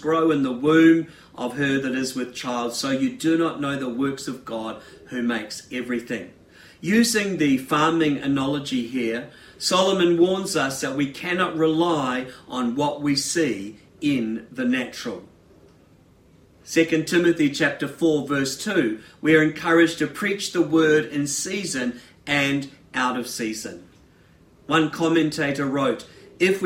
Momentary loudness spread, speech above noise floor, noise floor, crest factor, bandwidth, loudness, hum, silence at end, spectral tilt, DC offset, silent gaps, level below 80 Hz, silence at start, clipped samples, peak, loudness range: 13 LU; 32 dB; -54 dBFS; 18 dB; 16 kHz; -22 LUFS; none; 0 s; -4.5 dB/octave; under 0.1%; none; -62 dBFS; 0 s; under 0.1%; -4 dBFS; 6 LU